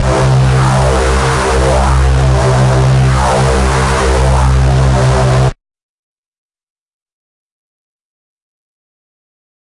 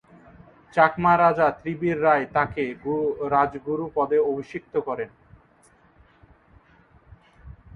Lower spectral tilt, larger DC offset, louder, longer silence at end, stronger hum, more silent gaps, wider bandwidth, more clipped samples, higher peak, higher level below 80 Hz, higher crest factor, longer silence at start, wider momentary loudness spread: second, -6 dB/octave vs -8 dB/octave; neither; first, -11 LUFS vs -23 LUFS; first, 4.1 s vs 0.2 s; neither; neither; first, 11.5 kHz vs 7 kHz; neither; about the same, -2 dBFS vs -4 dBFS; first, -16 dBFS vs -54 dBFS; second, 10 dB vs 22 dB; second, 0 s vs 0.75 s; second, 2 LU vs 11 LU